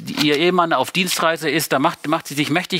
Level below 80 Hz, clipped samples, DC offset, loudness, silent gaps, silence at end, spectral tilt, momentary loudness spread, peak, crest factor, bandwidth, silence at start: -66 dBFS; under 0.1%; under 0.1%; -18 LUFS; none; 0 s; -4 dB/octave; 4 LU; -2 dBFS; 16 dB; 16 kHz; 0 s